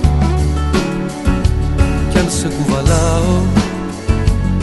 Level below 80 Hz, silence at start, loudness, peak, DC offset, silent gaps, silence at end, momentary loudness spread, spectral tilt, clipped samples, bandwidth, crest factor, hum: -18 dBFS; 0 s; -15 LUFS; 0 dBFS; under 0.1%; none; 0 s; 5 LU; -6 dB/octave; under 0.1%; 12 kHz; 14 dB; none